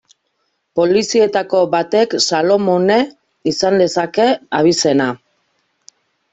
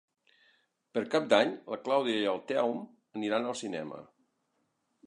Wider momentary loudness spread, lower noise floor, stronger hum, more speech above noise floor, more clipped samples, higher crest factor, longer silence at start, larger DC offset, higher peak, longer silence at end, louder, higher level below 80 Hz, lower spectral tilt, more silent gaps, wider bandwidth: second, 8 LU vs 14 LU; second, -68 dBFS vs -78 dBFS; neither; first, 54 dB vs 47 dB; neither; second, 14 dB vs 24 dB; second, 0.75 s vs 0.95 s; neither; first, -2 dBFS vs -8 dBFS; first, 1.15 s vs 1 s; first, -15 LUFS vs -31 LUFS; first, -58 dBFS vs -82 dBFS; about the same, -4 dB/octave vs -4.5 dB/octave; neither; second, 8.4 kHz vs 11 kHz